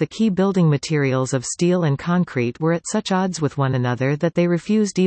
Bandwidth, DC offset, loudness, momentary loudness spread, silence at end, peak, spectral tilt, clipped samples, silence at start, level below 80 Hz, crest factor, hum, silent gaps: 8.8 kHz; under 0.1%; -20 LUFS; 4 LU; 0 s; -6 dBFS; -6 dB/octave; under 0.1%; 0 s; -58 dBFS; 14 dB; none; none